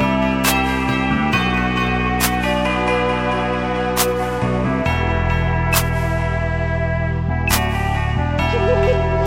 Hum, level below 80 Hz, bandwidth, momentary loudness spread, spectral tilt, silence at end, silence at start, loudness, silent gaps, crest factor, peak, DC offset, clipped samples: none; -26 dBFS; 18 kHz; 4 LU; -5 dB/octave; 0 s; 0 s; -18 LUFS; none; 16 dB; -2 dBFS; 0.4%; under 0.1%